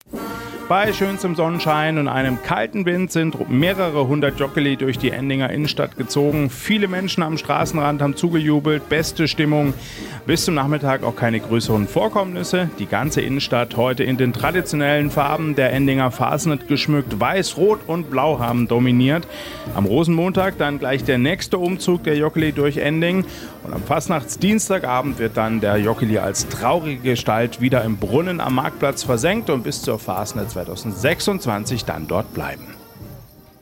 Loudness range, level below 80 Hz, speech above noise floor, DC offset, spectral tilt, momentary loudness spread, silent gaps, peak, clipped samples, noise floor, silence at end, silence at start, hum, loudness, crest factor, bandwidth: 2 LU; -44 dBFS; 23 dB; under 0.1%; -5.5 dB/octave; 6 LU; none; -4 dBFS; under 0.1%; -42 dBFS; 0.35 s; 0.1 s; none; -20 LUFS; 16 dB; 16.5 kHz